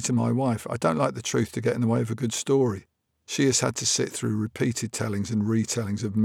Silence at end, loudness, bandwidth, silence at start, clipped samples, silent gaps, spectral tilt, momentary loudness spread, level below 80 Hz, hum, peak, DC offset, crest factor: 0 s; -26 LUFS; 16 kHz; 0 s; under 0.1%; none; -4.5 dB/octave; 5 LU; -62 dBFS; none; -8 dBFS; under 0.1%; 16 dB